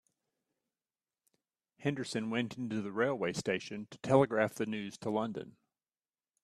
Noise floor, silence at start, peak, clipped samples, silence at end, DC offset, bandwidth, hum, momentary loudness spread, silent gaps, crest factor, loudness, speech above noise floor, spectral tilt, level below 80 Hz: under -90 dBFS; 1.8 s; -10 dBFS; under 0.1%; 0.95 s; under 0.1%; 13.5 kHz; none; 12 LU; none; 26 dB; -34 LUFS; over 56 dB; -5.5 dB/octave; -74 dBFS